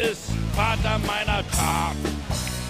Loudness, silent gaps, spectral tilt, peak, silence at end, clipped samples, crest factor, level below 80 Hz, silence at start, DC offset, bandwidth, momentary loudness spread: -24 LUFS; none; -4 dB/octave; -8 dBFS; 0 s; under 0.1%; 16 dB; -32 dBFS; 0 s; under 0.1%; 15.5 kHz; 5 LU